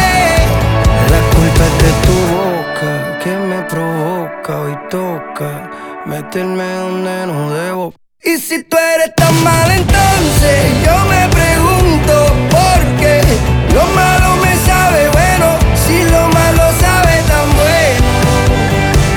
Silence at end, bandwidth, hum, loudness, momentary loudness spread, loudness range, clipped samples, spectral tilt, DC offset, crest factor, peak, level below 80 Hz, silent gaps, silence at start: 0 s; 19.5 kHz; none; -11 LUFS; 10 LU; 10 LU; under 0.1%; -5 dB/octave; under 0.1%; 10 dB; 0 dBFS; -18 dBFS; none; 0 s